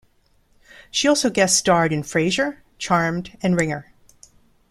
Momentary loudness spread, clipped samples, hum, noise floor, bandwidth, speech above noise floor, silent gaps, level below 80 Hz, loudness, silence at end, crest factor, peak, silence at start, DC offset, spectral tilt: 9 LU; under 0.1%; none; -60 dBFS; 14 kHz; 40 dB; none; -52 dBFS; -20 LUFS; 0.9 s; 20 dB; -2 dBFS; 0.95 s; under 0.1%; -3.5 dB/octave